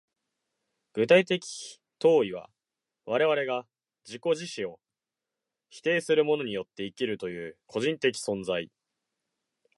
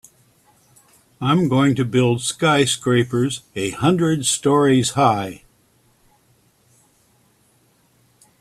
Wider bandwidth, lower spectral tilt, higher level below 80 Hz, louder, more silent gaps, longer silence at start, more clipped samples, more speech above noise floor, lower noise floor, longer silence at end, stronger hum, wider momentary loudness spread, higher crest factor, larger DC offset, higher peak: second, 11.5 kHz vs 14 kHz; about the same, -4.5 dB/octave vs -5 dB/octave; second, -72 dBFS vs -56 dBFS; second, -28 LUFS vs -18 LUFS; neither; second, 0.95 s vs 1.2 s; neither; first, 62 dB vs 41 dB; first, -89 dBFS vs -59 dBFS; second, 1.1 s vs 3.05 s; neither; first, 17 LU vs 8 LU; about the same, 22 dB vs 20 dB; neither; second, -8 dBFS vs 0 dBFS